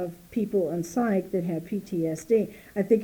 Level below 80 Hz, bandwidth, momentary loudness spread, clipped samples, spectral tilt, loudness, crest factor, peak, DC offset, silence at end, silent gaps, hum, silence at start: -62 dBFS; over 20 kHz; 7 LU; under 0.1%; -7.5 dB/octave; -28 LUFS; 18 dB; -10 dBFS; under 0.1%; 0 s; none; none; 0 s